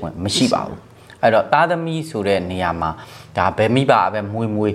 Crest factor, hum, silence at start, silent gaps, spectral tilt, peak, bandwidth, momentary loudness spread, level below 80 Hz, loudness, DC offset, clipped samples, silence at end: 18 dB; none; 0 s; none; -5.5 dB/octave; 0 dBFS; 14 kHz; 10 LU; -48 dBFS; -18 LUFS; under 0.1%; under 0.1%; 0 s